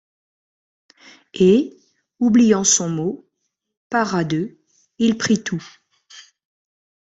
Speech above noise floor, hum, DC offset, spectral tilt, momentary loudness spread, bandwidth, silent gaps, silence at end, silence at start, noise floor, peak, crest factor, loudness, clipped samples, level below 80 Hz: 57 dB; none; under 0.1%; -4 dB/octave; 16 LU; 8.2 kHz; 3.77-3.90 s; 0.95 s; 1.35 s; -75 dBFS; -2 dBFS; 18 dB; -18 LUFS; under 0.1%; -60 dBFS